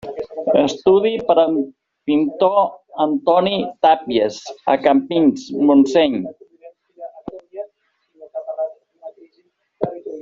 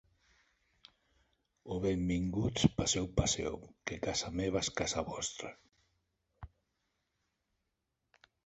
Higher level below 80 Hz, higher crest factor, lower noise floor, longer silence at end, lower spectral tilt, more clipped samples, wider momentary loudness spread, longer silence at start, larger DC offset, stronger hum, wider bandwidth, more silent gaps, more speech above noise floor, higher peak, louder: second, -60 dBFS vs -52 dBFS; second, 16 dB vs 26 dB; second, -63 dBFS vs -85 dBFS; second, 0 s vs 2 s; about the same, -4 dB/octave vs -4 dB/octave; neither; first, 19 LU vs 16 LU; second, 0.05 s vs 1.65 s; neither; neither; about the same, 7.6 kHz vs 8.2 kHz; neither; about the same, 47 dB vs 50 dB; first, -2 dBFS vs -12 dBFS; first, -17 LUFS vs -35 LUFS